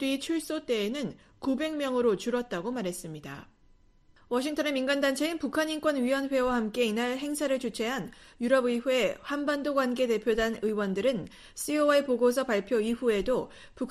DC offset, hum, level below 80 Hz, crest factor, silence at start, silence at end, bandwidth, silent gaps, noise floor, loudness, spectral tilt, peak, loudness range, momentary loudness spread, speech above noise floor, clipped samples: under 0.1%; none; -56 dBFS; 18 dB; 0 s; 0 s; 15.5 kHz; none; -60 dBFS; -29 LUFS; -4 dB/octave; -12 dBFS; 4 LU; 10 LU; 32 dB; under 0.1%